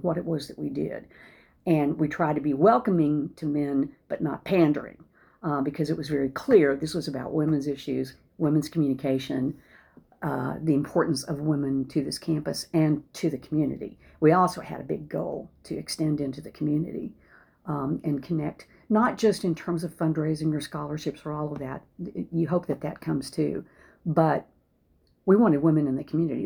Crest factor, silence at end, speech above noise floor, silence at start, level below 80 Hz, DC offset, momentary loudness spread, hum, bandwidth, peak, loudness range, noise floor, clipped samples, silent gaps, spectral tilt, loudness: 20 dB; 0 s; 40 dB; 0 s; -58 dBFS; under 0.1%; 13 LU; none; 20 kHz; -6 dBFS; 5 LU; -66 dBFS; under 0.1%; none; -7 dB/octave; -27 LUFS